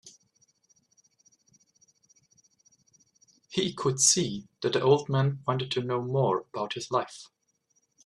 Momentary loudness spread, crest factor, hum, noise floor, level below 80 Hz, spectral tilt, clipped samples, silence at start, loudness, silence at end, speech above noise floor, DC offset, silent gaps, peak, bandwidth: 12 LU; 24 dB; none; -73 dBFS; -70 dBFS; -4 dB/octave; under 0.1%; 0.05 s; -27 LUFS; 0.8 s; 46 dB; under 0.1%; none; -6 dBFS; 13 kHz